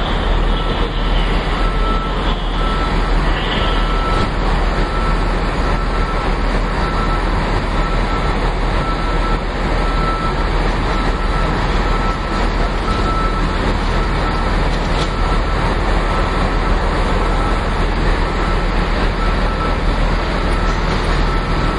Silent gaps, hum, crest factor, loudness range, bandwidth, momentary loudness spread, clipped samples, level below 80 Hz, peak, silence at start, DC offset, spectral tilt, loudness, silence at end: none; none; 14 dB; 1 LU; 10.5 kHz; 1 LU; under 0.1%; -18 dBFS; -2 dBFS; 0 s; under 0.1%; -6 dB/octave; -18 LUFS; 0 s